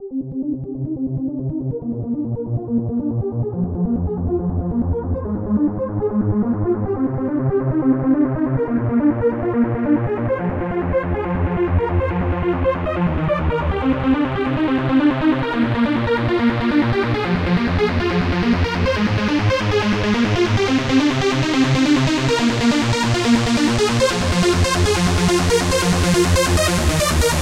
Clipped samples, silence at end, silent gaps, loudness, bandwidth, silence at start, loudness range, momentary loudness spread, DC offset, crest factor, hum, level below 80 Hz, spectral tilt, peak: under 0.1%; 0 s; none; -19 LUFS; 16 kHz; 0 s; 5 LU; 7 LU; under 0.1%; 14 dB; none; -32 dBFS; -5.5 dB/octave; -4 dBFS